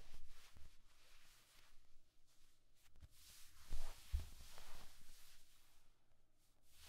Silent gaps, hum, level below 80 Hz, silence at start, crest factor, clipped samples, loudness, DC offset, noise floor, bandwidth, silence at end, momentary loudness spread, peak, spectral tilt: none; none; -54 dBFS; 0 s; 18 dB; under 0.1%; -59 LUFS; under 0.1%; -69 dBFS; 15.5 kHz; 0 s; 18 LU; -30 dBFS; -3.5 dB/octave